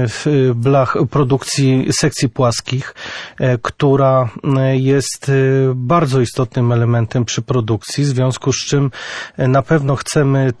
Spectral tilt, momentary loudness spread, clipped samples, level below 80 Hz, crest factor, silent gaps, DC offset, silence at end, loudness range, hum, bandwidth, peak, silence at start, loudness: -6 dB/octave; 6 LU; under 0.1%; -46 dBFS; 12 dB; none; under 0.1%; 0.05 s; 2 LU; none; 11 kHz; -2 dBFS; 0 s; -15 LUFS